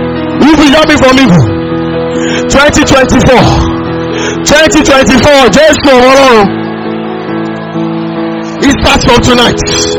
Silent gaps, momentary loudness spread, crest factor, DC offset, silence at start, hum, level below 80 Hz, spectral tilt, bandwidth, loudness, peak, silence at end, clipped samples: none; 12 LU; 6 dB; 0.4%; 0 s; none; -22 dBFS; -4.5 dB/octave; over 20 kHz; -6 LUFS; 0 dBFS; 0 s; 7%